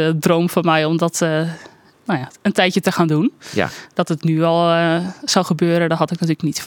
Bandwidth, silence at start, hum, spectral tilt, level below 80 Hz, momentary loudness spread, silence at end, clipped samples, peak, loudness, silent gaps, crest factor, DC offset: 17.5 kHz; 0 s; none; -5.5 dB/octave; -62 dBFS; 8 LU; 0 s; under 0.1%; 0 dBFS; -18 LUFS; none; 18 dB; under 0.1%